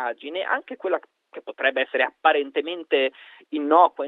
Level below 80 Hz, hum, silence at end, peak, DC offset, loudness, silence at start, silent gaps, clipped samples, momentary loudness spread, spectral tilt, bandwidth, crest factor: -82 dBFS; none; 0 s; -4 dBFS; under 0.1%; -23 LUFS; 0 s; none; under 0.1%; 12 LU; -5 dB/octave; 4.3 kHz; 20 dB